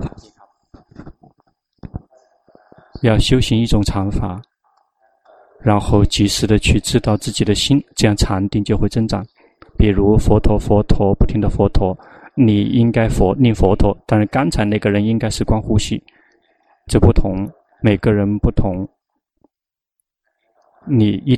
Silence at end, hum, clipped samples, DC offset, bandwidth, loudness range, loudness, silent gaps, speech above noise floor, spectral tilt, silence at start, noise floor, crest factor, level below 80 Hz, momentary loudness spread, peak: 0 s; none; under 0.1%; under 0.1%; 13.5 kHz; 5 LU; -16 LUFS; none; 73 dB; -6 dB/octave; 0 s; -87 dBFS; 16 dB; -24 dBFS; 12 LU; 0 dBFS